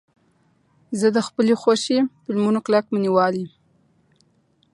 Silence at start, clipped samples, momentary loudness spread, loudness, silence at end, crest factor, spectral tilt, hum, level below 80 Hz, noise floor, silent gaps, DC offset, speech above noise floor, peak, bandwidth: 0.9 s; under 0.1%; 6 LU; -20 LUFS; 1.25 s; 18 dB; -5.5 dB/octave; none; -70 dBFS; -63 dBFS; none; under 0.1%; 43 dB; -4 dBFS; 11.5 kHz